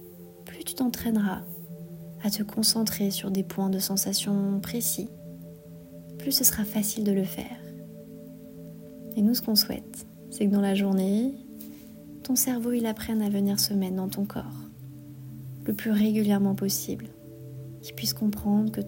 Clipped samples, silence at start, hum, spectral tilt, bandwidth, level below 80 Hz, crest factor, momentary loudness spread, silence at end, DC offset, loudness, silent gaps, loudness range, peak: under 0.1%; 0 s; none; -4 dB/octave; 16.5 kHz; -58 dBFS; 22 dB; 21 LU; 0 s; under 0.1%; -26 LUFS; none; 2 LU; -6 dBFS